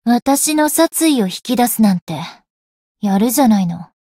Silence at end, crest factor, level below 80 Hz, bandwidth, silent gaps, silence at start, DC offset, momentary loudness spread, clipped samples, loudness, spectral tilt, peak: 0.2 s; 12 dB; -56 dBFS; 16.5 kHz; 2.02-2.07 s, 2.50-2.95 s; 0.05 s; under 0.1%; 11 LU; under 0.1%; -15 LUFS; -4.5 dB/octave; -2 dBFS